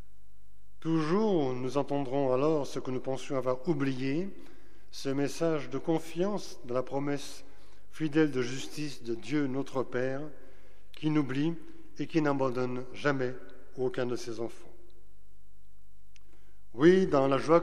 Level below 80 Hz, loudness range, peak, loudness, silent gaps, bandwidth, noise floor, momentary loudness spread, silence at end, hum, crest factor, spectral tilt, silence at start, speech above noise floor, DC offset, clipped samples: -62 dBFS; 4 LU; -10 dBFS; -31 LUFS; none; 14 kHz; -62 dBFS; 13 LU; 0 s; none; 22 dB; -6.5 dB/octave; 0.85 s; 32 dB; 2%; under 0.1%